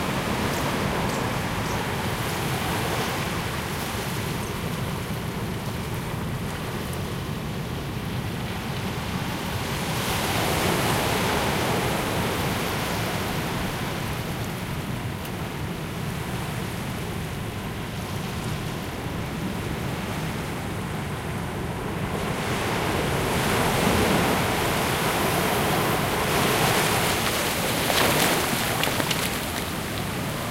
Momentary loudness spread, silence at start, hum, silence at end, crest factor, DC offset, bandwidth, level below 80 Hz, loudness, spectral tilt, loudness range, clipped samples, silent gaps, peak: 9 LU; 0 s; none; 0 s; 20 dB; under 0.1%; 16 kHz; -40 dBFS; -26 LUFS; -4 dB/octave; 8 LU; under 0.1%; none; -6 dBFS